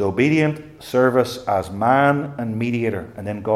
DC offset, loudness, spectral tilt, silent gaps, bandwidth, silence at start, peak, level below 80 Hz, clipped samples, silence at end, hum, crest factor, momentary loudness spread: under 0.1%; -20 LUFS; -7 dB/octave; none; 15.5 kHz; 0 s; -2 dBFS; -56 dBFS; under 0.1%; 0 s; none; 16 dB; 11 LU